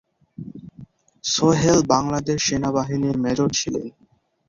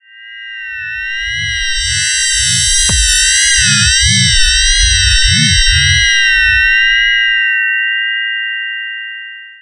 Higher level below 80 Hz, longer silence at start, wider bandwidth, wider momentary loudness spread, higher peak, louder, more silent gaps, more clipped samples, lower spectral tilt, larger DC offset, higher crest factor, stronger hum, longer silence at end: second, -50 dBFS vs -22 dBFS; first, 0.4 s vs 0.15 s; second, 7.6 kHz vs 11.5 kHz; first, 21 LU vs 13 LU; about the same, -2 dBFS vs 0 dBFS; second, -20 LUFS vs -9 LUFS; neither; neither; first, -4.5 dB/octave vs 0 dB/octave; neither; first, 20 dB vs 12 dB; neither; first, 0.6 s vs 0.05 s